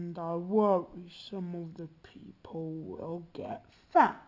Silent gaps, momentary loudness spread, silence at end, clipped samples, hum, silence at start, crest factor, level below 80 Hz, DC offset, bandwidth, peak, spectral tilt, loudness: none; 20 LU; 0.05 s; under 0.1%; none; 0 s; 22 dB; -68 dBFS; under 0.1%; 7.6 kHz; -10 dBFS; -8 dB/octave; -33 LUFS